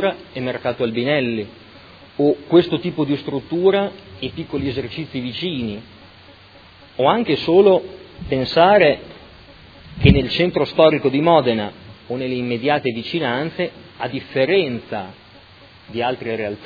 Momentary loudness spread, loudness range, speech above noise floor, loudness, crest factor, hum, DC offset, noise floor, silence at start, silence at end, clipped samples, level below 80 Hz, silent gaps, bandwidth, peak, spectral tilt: 15 LU; 7 LU; 27 dB; -19 LUFS; 20 dB; none; under 0.1%; -45 dBFS; 0 s; 0 s; under 0.1%; -40 dBFS; none; 5 kHz; 0 dBFS; -8.5 dB/octave